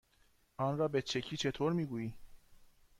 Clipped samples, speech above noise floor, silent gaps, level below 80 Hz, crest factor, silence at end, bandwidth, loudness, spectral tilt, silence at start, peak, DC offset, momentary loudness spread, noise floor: under 0.1%; 35 dB; none; -64 dBFS; 16 dB; 0.35 s; 15.5 kHz; -36 LUFS; -5.5 dB/octave; 0.6 s; -22 dBFS; under 0.1%; 9 LU; -70 dBFS